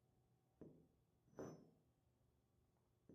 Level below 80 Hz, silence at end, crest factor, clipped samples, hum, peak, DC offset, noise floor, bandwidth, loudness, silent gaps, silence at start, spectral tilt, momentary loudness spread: -88 dBFS; 0 s; 24 dB; under 0.1%; none; -42 dBFS; under 0.1%; -82 dBFS; 12.5 kHz; -62 LUFS; none; 0 s; -7 dB/octave; 9 LU